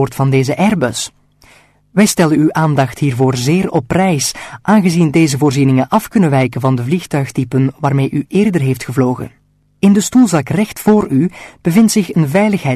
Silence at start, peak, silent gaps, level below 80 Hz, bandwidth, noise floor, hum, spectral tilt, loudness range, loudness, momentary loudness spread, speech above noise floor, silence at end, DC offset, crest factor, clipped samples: 0 s; -2 dBFS; none; -46 dBFS; 13.5 kHz; -47 dBFS; none; -6 dB/octave; 2 LU; -13 LUFS; 6 LU; 35 dB; 0 s; under 0.1%; 12 dB; under 0.1%